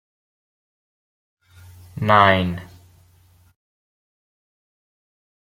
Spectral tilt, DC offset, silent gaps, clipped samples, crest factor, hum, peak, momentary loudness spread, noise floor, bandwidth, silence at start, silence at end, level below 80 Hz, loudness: -7 dB/octave; under 0.1%; none; under 0.1%; 24 dB; none; -2 dBFS; 21 LU; -55 dBFS; 16 kHz; 1.95 s; 2.85 s; -60 dBFS; -17 LUFS